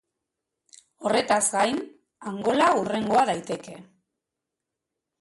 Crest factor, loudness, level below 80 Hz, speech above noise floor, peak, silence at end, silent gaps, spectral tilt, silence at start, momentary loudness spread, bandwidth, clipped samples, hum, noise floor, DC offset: 18 dB; -24 LUFS; -68 dBFS; 62 dB; -8 dBFS; 1.4 s; none; -3 dB/octave; 1 s; 16 LU; 12 kHz; under 0.1%; none; -85 dBFS; under 0.1%